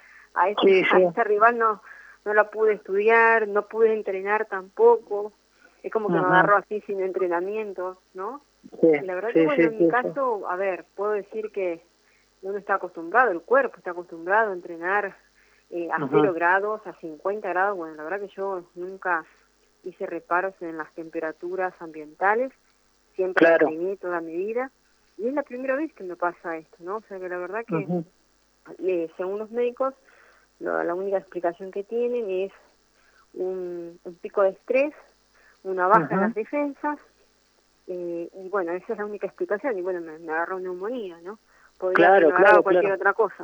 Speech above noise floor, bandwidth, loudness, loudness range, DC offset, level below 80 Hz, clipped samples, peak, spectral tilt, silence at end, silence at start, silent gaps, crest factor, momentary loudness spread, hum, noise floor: 40 dB; over 20 kHz; -24 LUFS; 9 LU; under 0.1%; -74 dBFS; under 0.1%; -4 dBFS; -7 dB/octave; 0 s; 0.35 s; none; 20 dB; 16 LU; none; -63 dBFS